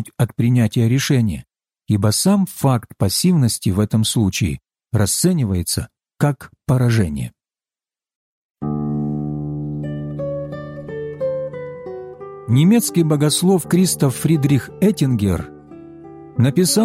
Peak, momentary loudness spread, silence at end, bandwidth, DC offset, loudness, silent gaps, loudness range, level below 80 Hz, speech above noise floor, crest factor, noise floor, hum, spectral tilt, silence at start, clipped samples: -4 dBFS; 16 LU; 0 s; 16.5 kHz; under 0.1%; -18 LUFS; 8.15-8.55 s; 9 LU; -44 dBFS; over 74 dB; 14 dB; under -90 dBFS; none; -5.5 dB/octave; 0 s; under 0.1%